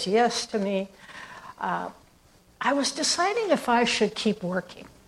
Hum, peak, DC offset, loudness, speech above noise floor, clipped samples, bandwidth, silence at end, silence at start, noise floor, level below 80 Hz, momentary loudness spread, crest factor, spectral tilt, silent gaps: none; -8 dBFS; under 0.1%; -25 LUFS; 32 dB; under 0.1%; 14.5 kHz; 0.2 s; 0 s; -58 dBFS; -64 dBFS; 18 LU; 18 dB; -3 dB/octave; none